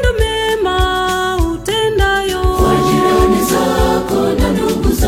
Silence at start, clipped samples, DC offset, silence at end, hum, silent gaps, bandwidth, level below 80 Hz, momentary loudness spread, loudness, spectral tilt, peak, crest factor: 0 s; under 0.1%; under 0.1%; 0 s; none; none; 16.5 kHz; -20 dBFS; 4 LU; -14 LUFS; -5 dB/octave; 0 dBFS; 12 dB